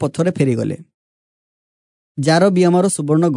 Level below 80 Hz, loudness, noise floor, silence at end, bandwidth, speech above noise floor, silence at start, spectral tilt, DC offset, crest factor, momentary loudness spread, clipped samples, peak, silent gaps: -64 dBFS; -16 LUFS; under -90 dBFS; 0 s; 11 kHz; over 75 dB; 0 s; -6 dB/octave; under 0.1%; 16 dB; 13 LU; under 0.1%; -2 dBFS; 0.94-2.15 s